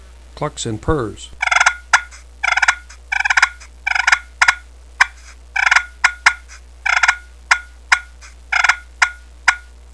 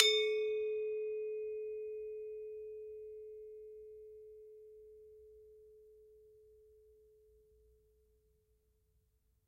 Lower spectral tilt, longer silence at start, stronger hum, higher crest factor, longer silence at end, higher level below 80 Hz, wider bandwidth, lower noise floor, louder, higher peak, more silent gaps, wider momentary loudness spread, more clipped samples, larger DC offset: first, -1.5 dB/octave vs 0 dB/octave; first, 0.4 s vs 0 s; neither; second, 18 dB vs 34 dB; second, 0.3 s vs 2.9 s; first, -38 dBFS vs -76 dBFS; second, 11 kHz vs 14 kHz; second, -39 dBFS vs -76 dBFS; first, -16 LUFS vs -39 LUFS; first, 0 dBFS vs -8 dBFS; neither; second, 12 LU vs 24 LU; neither; first, 0.3% vs under 0.1%